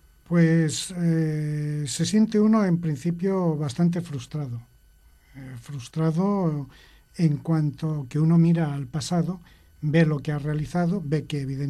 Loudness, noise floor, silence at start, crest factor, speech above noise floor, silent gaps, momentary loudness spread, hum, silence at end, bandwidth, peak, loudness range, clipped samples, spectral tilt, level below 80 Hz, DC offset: -24 LUFS; -56 dBFS; 0.3 s; 16 dB; 32 dB; none; 14 LU; none; 0 s; 12.5 kHz; -8 dBFS; 5 LU; under 0.1%; -7 dB/octave; -54 dBFS; under 0.1%